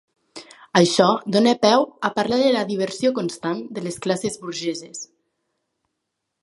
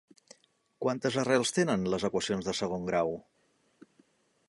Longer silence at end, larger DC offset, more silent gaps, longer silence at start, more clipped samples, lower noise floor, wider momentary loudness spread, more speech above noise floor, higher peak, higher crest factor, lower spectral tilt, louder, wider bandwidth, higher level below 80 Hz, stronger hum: about the same, 1.4 s vs 1.3 s; neither; neither; second, 0.35 s vs 0.8 s; neither; first, -79 dBFS vs -68 dBFS; first, 16 LU vs 7 LU; first, 59 dB vs 38 dB; first, 0 dBFS vs -12 dBFS; about the same, 22 dB vs 20 dB; about the same, -4.5 dB/octave vs -4.5 dB/octave; first, -20 LUFS vs -30 LUFS; about the same, 11.5 kHz vs 11.5 kHz; about the same, -66 dBFS vs -64 dBFS; neither